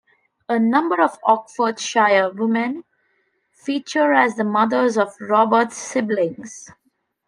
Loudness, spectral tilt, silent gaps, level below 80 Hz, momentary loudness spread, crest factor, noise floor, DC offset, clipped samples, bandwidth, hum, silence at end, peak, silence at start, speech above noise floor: -19 LUFS; -4.5 dB/octave; none; -74 dBFS; 10 LU; 18 dB; -67 dBFS; under 0.1%; under 0.1%; 10.5 kHz; none; 0.6 s; -2 dBFS; 0.5 s; 48 dB